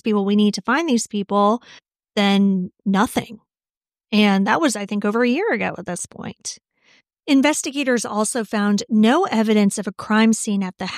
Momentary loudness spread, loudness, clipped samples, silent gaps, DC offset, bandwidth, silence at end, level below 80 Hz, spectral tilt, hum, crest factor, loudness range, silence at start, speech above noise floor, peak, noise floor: 12 LU; -19 LUFS; under 0.1%; 3.77-3.81 s; under 0.1%; 15 kHz; 0 s; -62 dBFS; -4.5 dB/octave; none; 18 dB; 3 LU; 0.05 s; over 71 dB; -2 dBFS; under -90 dBFS